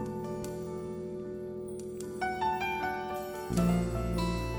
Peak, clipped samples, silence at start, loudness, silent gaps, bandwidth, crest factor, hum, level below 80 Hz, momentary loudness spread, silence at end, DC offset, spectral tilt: -14 dBFS; under 0.1%; 0 s; -34 LUFS; none; 19 kHz; 18 dB; none; -44 dBFS; 11 LU; 0 s; under 0.1%; -6 dB/octave